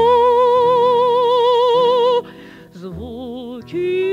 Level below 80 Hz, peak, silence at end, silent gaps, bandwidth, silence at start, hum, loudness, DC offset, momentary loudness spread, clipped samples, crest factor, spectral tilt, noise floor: -50 dBFS; -4 dBFS; 0 s; none; 7.4 kHz; 0 s; none; -14 LUFS; under 0.1%; 18 LU; under 0.1%; 10 dB; -6 dB/octave; -39 dBFS